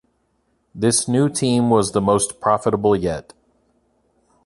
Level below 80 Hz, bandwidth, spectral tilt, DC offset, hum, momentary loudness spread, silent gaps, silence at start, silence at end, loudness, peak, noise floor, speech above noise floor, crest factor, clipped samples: -48 dBFS; 12 kHz; -5 dB/octave; under 0.1%; none; 5 LU; none; 0.75 s; 1.25 s; -18 LUFS; -2 dBFS; -66 dBFS; 48 dB; 18 dB; under 0.1%